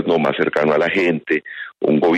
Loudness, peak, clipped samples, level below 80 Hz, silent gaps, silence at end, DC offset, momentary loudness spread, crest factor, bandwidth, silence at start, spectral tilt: -18 LUFS; -4 dBFS; under 0.1%; -58 dBFS; none; 0 s; under 0.1%; 6 LU; 12 dB; 8.6 kHz; 0 s; -7 dB/octave